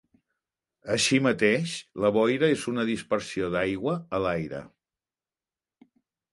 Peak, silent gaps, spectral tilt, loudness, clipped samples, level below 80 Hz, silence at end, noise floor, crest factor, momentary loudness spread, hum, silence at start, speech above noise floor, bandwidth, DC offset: -8 dBFS; none; -4.5 dB/octave; -26 LUFS; under 0.1%; -58 dBFS; 1.65 s; under -90 dBFS; 20 dB; 10 LU; none; 0.85 s; over 64 dB; 11.5 kHz; under 0.1%